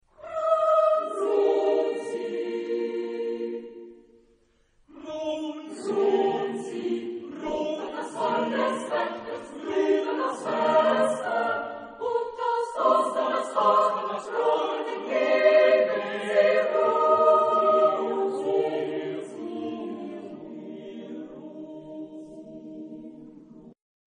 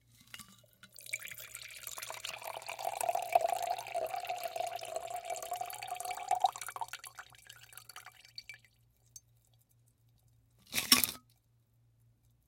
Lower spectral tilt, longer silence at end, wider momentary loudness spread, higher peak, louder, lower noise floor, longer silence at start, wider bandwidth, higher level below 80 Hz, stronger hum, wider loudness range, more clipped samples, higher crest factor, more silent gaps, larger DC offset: first, -4.5 dB/octave vs -0.5 dB/octave; second, 0.5 s vs 1.3 s; about the same, 19 LU vs 21 LU; second, -8 dBFS vs -4 dBFS; first, -25 LUFS vs -36 LUFS; second, -64 dBFS vs -71 dBFS; second, 0.2 s vs 0.35 s; second, 10 kHz vs 17 kHz; about the same, -70 dBFS vs -74 dBFS; neither; about the same, 15 LU vs 15 LU; neither; second, 18 dB vs 34 dB; neither; neither